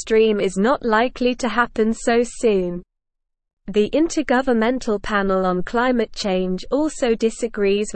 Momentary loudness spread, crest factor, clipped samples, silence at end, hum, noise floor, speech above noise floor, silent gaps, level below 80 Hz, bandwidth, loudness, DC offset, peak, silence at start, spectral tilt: 5 LU; 16 dB; under 0.1%; 0 s; none; -78 dBFS; 59 dB; 3.53-3.57 s; -42 dBFS; 8.8 kHz; -20 LUFS; 0.3%; -4 dBFS; 0 s; -5 dB/octave